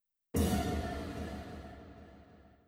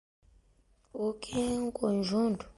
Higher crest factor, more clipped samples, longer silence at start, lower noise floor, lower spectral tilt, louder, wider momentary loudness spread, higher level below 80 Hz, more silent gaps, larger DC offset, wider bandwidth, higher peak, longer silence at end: about the same, 18 dB vs 18 dB; neither; second, 0.35 s vs 0.95 s; second, -59 dBFS vs -67 dBFS; about the same, -6 dB/octave vs -6 dB/octave; second, -37 LUFS vs -32 LUFS; first, 23 LU vs 7 LU; first, -46 dBFS vs -58 dBFS; neither; neither; first, 16.5 kHz vs 11.5 kHz; second, -20 dBFS vs -16 dBFS; about the same, 0.15 s vs 0.05 s